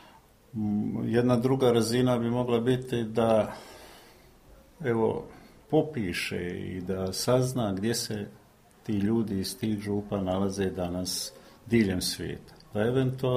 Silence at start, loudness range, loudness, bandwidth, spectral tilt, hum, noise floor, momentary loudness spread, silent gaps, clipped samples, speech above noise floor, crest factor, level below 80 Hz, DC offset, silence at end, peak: 0.55 s; 5 LU; -28 LUFS; 15.5 kHz; -5.5 dB/octave; none; -56 dBFS; 13 LU; none; under 0.1%; 29 dB; 18 dB; -56 dBFS; under 0.1%; 0 s; -10 dBFS